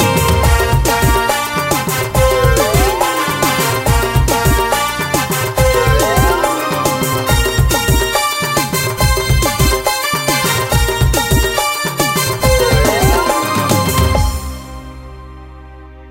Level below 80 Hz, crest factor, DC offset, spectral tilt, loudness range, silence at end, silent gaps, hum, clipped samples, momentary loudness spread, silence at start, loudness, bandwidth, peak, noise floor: -20 dBFS; 14 dB; under 0.1%; -4 dB/octave; 1 LU; 0 s; none; none; under 0.1%; 4 LU; 0 s; -13 LUFS; 16.5 kHz; 0 dBFS; -34 dBFS